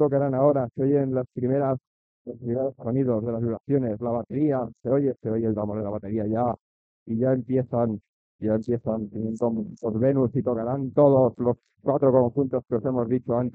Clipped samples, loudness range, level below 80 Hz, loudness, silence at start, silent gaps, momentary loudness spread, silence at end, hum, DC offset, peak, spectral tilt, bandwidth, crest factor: under 0.1%; 4 LU; -60 dBFS; -25 LUFS; 0 s; 1.87-2.25 s, 3.60-3.64 s, 6.60-7.06 s, 8.09-8.39 s; 9 LU; 0 s; none; under 0.1%; -6 dBFS; -11.5 dB/octave; 6.6 kHz; 18 dB